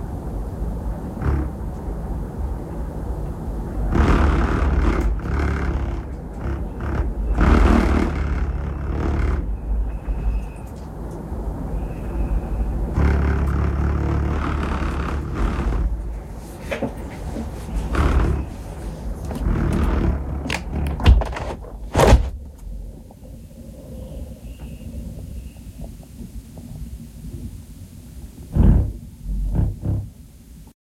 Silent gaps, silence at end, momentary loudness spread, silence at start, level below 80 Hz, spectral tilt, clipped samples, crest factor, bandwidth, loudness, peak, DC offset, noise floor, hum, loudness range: none; 0.1 s; 19 LU; 0 s; -24 dBFS; -7 dB/octave; under 0.1%; 22 dB; 13.5 kHz; -23 LUFS; 0 dBFS; under 0.1%; -42 dBFS; none; 15 LU